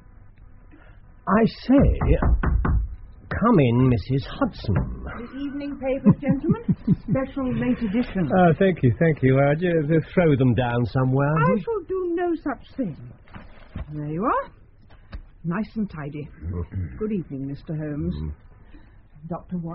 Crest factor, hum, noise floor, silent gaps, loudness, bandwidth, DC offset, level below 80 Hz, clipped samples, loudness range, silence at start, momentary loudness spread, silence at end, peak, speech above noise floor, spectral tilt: 20 dB; none; -48 dBFS; none; -23 LUFS; 5.8 kHz; under 0.1%; -34 dBFS; under 0.1%; 11 LU; 0.25 s; 16 LU; 0 s; -4 dBFS; 27 dB; -8 dB/octave